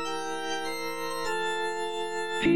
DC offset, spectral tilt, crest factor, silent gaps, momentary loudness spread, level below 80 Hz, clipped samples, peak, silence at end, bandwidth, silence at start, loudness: 1%; -3.5 dB/octave; 18 dB; none; 3 LU; -58 dBFS; under 0.1%; -14 dBFS; 0 s; 16 kHz; 0 s; -31 LUFS